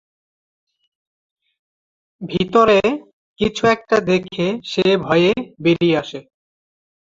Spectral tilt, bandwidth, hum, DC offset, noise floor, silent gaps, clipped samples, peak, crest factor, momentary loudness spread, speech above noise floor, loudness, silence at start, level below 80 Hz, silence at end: -6 dB/octave; 7.8 kHz; none; under 0.1%; under -90 dBFS; 3.13-3.36 s; under 0.1%; -2 dBFS; 18 dB; 12 LU; over 73 dB; -17 LUFS; 2.2 s; -52 dBFS; 0.8 s